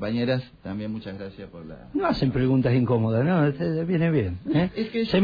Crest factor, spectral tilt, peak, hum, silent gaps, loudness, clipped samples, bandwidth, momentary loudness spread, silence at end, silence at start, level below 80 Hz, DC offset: 14 dB; -9.5 dB/octave; -10 dBFS; none; none; -24 LUFS; under 0.1%; 5 kHz; 15 LU; 0 s; 0 s; -48 dBFS; under 0.1%